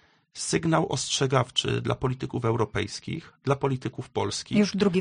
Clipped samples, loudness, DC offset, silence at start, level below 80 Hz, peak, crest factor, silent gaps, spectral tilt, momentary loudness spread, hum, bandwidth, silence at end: under 0.1%; -27 LUFS; under 0.1%; 0.35 s; -54 dBFS; -8 dBFS; 18 dB; none; -5 dB/octave; 9 LU; none; 10 kHz; 0 s